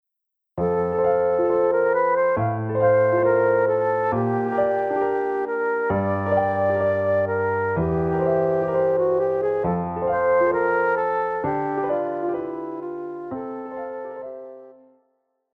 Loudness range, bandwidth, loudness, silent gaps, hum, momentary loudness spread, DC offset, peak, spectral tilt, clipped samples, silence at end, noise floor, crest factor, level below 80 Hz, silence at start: 8 LU; 4.3 kHz; -22 LUFS; none; none; 13 LU; under 0.1%; -8 dBFS; -10 dB/octave; under 0.1%; 0.85 s; -81 dBFS; 14 dB; -52 dBFS; 0.55 s